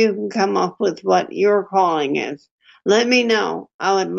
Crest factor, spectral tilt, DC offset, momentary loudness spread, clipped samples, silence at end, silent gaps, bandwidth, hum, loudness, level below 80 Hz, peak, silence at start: 16 dB; -4 dB/octave; under 0.1%; 9 LU; under 0.1%; 0 s; 2.51-2.58 s, 3.74-3.79 s; 7.8 kHz; none; -18 LUFS; -70 dBFS; -4 dBFS; 0 s